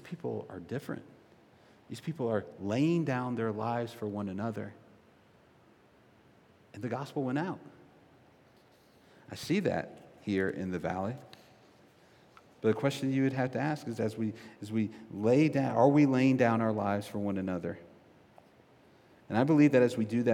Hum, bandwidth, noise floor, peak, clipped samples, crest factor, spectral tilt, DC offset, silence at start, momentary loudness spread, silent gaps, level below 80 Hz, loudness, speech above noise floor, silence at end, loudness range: none; 15.5 kHz; -62 dBFS; -12 dBFS; under 0.1%; 20 dB; -7.5 dB/octave; under 0.1%; 0.05 s; 17 LU; none; -76 dBFS; -31 LUFS; 32 dB; 0 s; 12 LU